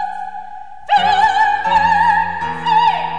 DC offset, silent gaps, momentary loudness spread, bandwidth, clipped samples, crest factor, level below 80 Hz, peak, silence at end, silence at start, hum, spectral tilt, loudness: 2%; none; 17 LU; 9.8 kHz; under 0.1%; 12 dB; -48 dBFS; -2 dBFS; 0 s; 0 s; none; -3.5 dB/octave; -14 LUFS